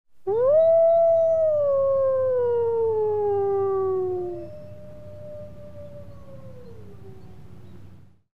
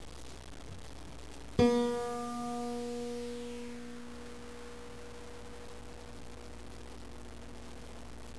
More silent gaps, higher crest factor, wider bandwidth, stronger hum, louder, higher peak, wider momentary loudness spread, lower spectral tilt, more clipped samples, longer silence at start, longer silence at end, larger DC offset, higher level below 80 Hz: neither; second, 12 dB vs 26 dB; second, 4.1 kHz vs 11 kHz; neither; first, -21 LUFS vs -38 LUFS; about the same, -12 dBFS vs -14 dBFS; first, 25 LU vs 18 LU; first, -9.5 dB/octave vs -5.5 dB/octave; neither; about the same, 0.05 s vs 0 s; about the same, 0.05 s vs 0 s; about the same, 0.8% vs 0.4%; about the same, -56 dBFS vs -54 dBFS